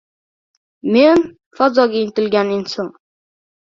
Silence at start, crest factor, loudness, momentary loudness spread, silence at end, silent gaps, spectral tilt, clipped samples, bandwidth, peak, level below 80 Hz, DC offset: 0.85 s; 18 dB; -15 LUFS; 15 LU; 0.9 s; 1.46-1.51 s; -6 dB/octave; under 0.1%; 7.6 kHz; 0 dBFS; -60 dBFS; under 0.1%